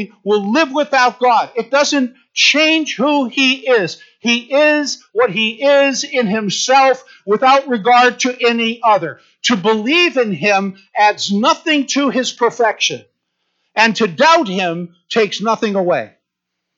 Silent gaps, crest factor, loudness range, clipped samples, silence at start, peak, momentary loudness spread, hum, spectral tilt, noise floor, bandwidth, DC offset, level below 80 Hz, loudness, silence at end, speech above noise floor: none; 14 dB; 2 LU; under 0.1%; 0 s; -2 dBFS; 8 LU; none; -3 dB/octave; -77 dBFS; 8 kHz; under 0.1%; -72 dBFS; -14 LUFS; 0.7 s; 62 dB